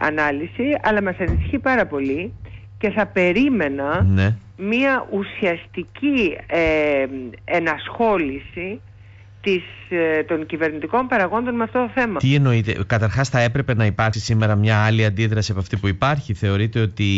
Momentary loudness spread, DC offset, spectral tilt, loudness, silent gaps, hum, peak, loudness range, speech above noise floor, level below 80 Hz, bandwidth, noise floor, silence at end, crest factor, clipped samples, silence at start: 9 LU; under 0.1%; -7 dB/octave; -20 LUFS; none; none; -6 dBFS; 4 LU; 24 dB; -40 dBFS; 8 kHz; -43 dBFS; 0 s; 14 dB; under 0.1%; 0 s